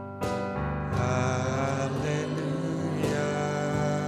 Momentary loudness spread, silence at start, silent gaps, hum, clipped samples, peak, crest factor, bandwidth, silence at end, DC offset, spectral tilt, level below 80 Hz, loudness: 4 LU; 0 s; none; none; under 0.1%; -14 dBFS; 14 dB; 14 kHz; 0 s; under 0.1%; -6.5 dB/octave; -46 dBFS; -29 LUFS